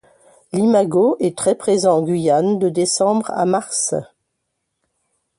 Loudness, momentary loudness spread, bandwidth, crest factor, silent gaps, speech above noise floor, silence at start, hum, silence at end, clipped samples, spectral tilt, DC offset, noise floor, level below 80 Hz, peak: -17 LUFS; 4 LU; 11.5 kHz; 14 dB; none; 58 dB; 0.55 s; none; 1.35 s; under 0.1%; -5 dB/octave; under 0.1%; -74 dBFS; -62 dBFS; -4 dBFS